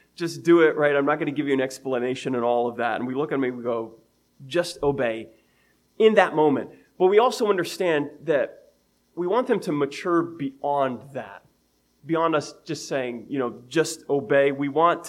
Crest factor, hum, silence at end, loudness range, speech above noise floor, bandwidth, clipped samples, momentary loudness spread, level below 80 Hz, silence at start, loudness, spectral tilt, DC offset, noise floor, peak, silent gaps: 20 dB; none; 0 s; 6 LU; 43 dB; 15 kHz; under 0.1%; 12 LU; -64 dBFS; 0.2 s; -23 LUFS; -5.5 dB/octave; under 0.1%; -66 dBFS; -4 dBFS; none